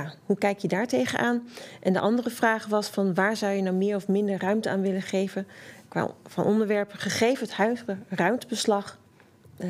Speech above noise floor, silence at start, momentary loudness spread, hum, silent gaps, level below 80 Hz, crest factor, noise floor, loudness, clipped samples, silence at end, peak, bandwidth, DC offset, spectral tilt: 29 dB; 0 s; 7 LU; none; none; -76 dBFS; 18 dB; -55 dBFS; -26 LUFS; under 0.1%; 0 s; -8 dBFS; 16 kHz; under 0.1%; -5.5 dB/octave